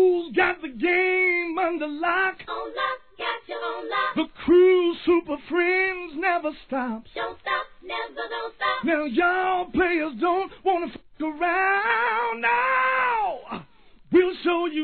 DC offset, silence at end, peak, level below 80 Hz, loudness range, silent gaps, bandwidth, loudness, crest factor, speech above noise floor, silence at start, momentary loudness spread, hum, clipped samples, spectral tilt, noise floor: 0.2%; 0 s; -8 dBFS; -56 dBFS; 4 LU; none; 4.5 kHz; -23 LUFS; 16 dB; 30 dB; 0 s; 11 LU; none; under 0.1%; -8 dB/octave; -53 dBFS